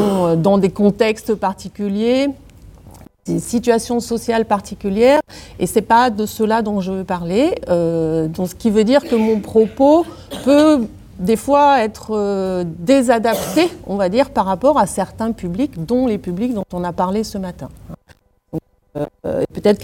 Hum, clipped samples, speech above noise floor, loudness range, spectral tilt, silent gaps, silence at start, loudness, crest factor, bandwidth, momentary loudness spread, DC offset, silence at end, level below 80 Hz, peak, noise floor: none; under 0.1%; 36 dB; 6 LU; -6 dB/octave; none; 0 s; -17 LUFS; 16 dB; 17 kHz; 12 LU; under 0.1%; 0 s; -44 dBFS; 0 dBFS; -52 dBFS